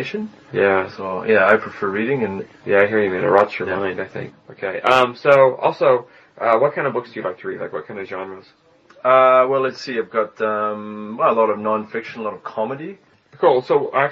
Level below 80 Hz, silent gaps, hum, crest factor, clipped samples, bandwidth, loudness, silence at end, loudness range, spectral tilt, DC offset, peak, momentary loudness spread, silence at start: -66 dBFS; none; none; 18 dB; under 0.1%; 7.6 kHz; -18 LUFS; 0 s; 4 LU; -3.5 dB/octave; under 0.1%; 0 dBFS; 15 LU; 0 s